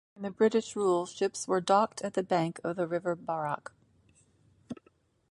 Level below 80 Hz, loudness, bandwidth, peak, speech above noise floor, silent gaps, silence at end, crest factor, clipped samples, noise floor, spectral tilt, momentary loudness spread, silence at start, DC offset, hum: -74 dBFS; -30 LUFS; 11.5 kHz; -12 dBFS; 38 dB; none; 0.6 s; 20 dB; under 0.1%; -68 dBFS; -5 dB/octave; 20 LU; 0.2 s; under 0.1%; none